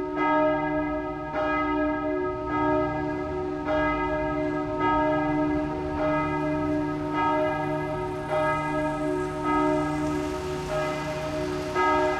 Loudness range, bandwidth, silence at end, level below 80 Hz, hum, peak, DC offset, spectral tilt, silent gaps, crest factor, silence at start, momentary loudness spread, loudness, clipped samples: 1 LU; 12 kHz; 0 s; -44 dBFS; none; -10 dBFS; under 0.1%; -6.5 dB/octave; none; 16 dB; 0 s; 6 LU; -26 LUFS; under 0.1%